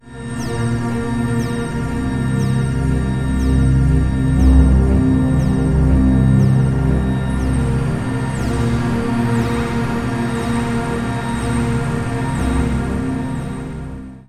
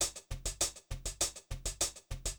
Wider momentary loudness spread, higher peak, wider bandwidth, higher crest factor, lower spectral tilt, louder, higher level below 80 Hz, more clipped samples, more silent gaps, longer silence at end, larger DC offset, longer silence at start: about the same, 8 LU vs 7 LU; first, -2 dBFS vs -18 dBFS; second, 13 kHz vs over 20 kHz; second, 14 dB vs 20 dB; first, -7.5 dB/octave vs -1.5 dB/octave; first, -18 LUFS vs -37 LUFS; first, -22 dBFS vs -46 dBFS; neither; neither; about the same, 0.05 s vs 0 s; neither; about the same, 0.05 s vs 0 s